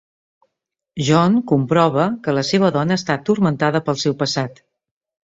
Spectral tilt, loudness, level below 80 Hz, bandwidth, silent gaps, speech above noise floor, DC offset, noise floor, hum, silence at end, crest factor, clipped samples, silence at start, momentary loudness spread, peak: -6 dB/octave; -18 LUFS; -56 dBFS; 7.8 kHz; none; 63 dB; under 0.1%; -80 dBFS; none; 0.8 s; 16 dB; under 0.1%; 0.95 s; 6 LU; -2 dBFS